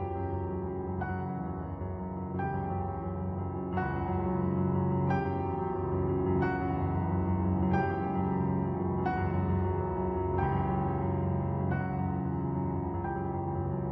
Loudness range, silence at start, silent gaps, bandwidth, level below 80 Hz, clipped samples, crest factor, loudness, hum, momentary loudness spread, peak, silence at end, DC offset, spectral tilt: 5 LU; 0 s; none; 5.2 kHz; -46 dBFS; under 0.1%; 14 dB; -32 LUFS; none; 6 LU; -16 dBFS; 0 s; under 0.1%; -11 dB/octave